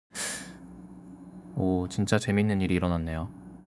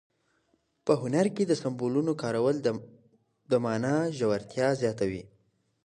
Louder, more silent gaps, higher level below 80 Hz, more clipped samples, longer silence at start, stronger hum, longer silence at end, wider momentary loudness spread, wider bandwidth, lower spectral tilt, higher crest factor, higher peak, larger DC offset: about the same, -28 LUFS vs -28 LUFS; neither; first, -54 dBFS vs -66 dBFS; neither; second, 0.15 s vs 0.85 s; neither; second, 0.15 s vs 0.6 s; first, 21 LU vs 6 LU; about the same, 12 kHz vs 11 kHz; about the same, -5.5 dB/octave vs -6.5 dB/octave; about the same, 20 dB vs 20 dB; about the same, -8 dBFS vs -10 dBFS; neither